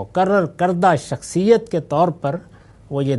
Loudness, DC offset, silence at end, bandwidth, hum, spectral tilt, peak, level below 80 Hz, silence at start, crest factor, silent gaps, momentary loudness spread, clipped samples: -18 LUFS; under 0.1%; 0 s; 11.5 kHz; none; -6.5 dB/octave; -2 dBFS; -52 dBFS; 0 s; 16 dB; none; 10 LU; under 0.1%